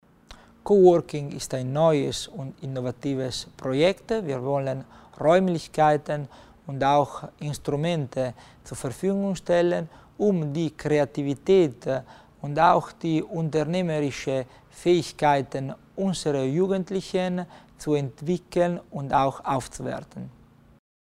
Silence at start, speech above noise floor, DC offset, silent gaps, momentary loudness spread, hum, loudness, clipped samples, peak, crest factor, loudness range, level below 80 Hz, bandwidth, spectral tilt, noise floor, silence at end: 0.3 s; 25 dB; under 0.1%; none; 13 LU; none; -25 LUFS; under 0.1%; -6 dBFS; 20 dB; 3 LU; -54 dBFS; 14 kHz; -6.5 dB/octave; -50 dBFS; 0.9 s